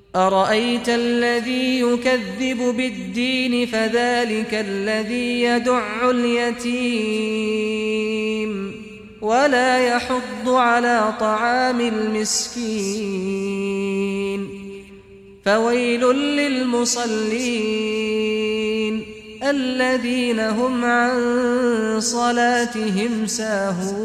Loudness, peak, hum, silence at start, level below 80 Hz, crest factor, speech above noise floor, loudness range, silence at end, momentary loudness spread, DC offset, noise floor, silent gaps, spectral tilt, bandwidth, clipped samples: -20 LUFS; -4 dBFS; none; 0.15 s; -54 dBFS; 16 dB; 24 dB; 3 LU; 0 s; 7 LU; under 0.1%; -44 dBFS; none; -3.5 dB/octave; 14.5 kHz; under 0.1%